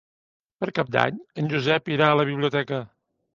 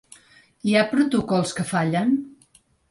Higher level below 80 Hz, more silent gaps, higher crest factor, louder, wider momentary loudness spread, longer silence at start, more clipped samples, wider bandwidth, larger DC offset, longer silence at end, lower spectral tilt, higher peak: second, -64 dBFS vs -58 dBFS; neither; first, 24 dB vs 16 dB; about the same, -24 LUFS vs -22 LUFS; first, 10 LU vs 7 LU; about the same, 0.6 s vs 0.65 s; neither; second, 7.4 kHz vs 11.5 kHz; neither; about the same, 0.5 s vs 0.6 s; first, -7 dB/octave vs -5.5 dB/octave; first, -2 dBFS vs -6 dBFS